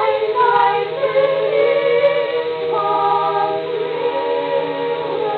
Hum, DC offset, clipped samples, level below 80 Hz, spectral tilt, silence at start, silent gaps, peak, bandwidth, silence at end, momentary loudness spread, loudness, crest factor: none; under 0.1%; under 0.1%; -70 dBFS; -7 dB/octave; 0 s; none; -4 dBFS; 4.8 kHz; 0 s; 6 LU; -17 LUFS; 14 dB